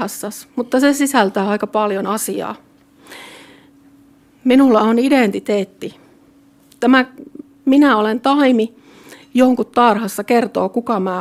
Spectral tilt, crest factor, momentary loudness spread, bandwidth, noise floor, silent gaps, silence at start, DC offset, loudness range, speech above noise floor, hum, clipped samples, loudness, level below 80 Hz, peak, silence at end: -4.5 dB/octave; 16 dB; 15 LU; 16 kHz; -50 dBFS; none; 0 s; under 0.1%; 4 LU; 35 dB; none; under 0.1%; -15 LUFS; -60 dBFS; -2 dBFS; 0 s